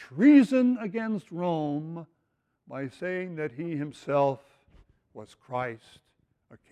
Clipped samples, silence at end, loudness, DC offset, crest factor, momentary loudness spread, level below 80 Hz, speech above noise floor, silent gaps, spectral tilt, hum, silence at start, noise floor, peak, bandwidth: under 0.1%; 0.15 s; -27 LUFS; under 0.1%; 20 dB; 22 LU; -70 dBFS; 50 dB; none; -8 dB/octave; none; 0 s; -77 dBFS; -8 dBFS; 9.4 kHz